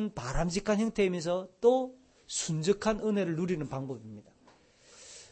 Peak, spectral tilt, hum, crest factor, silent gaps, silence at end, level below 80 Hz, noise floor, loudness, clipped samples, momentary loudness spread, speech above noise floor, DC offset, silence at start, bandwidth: -12 dBFS; -5 dB/octave; none; 20 dB; none; 0.05 s; -48 dBFS; -62 dBFS; -31 LUFS; under 0.1%; 16 LU; 32 dB; under 0.1%; 0 s; 8.8 kHz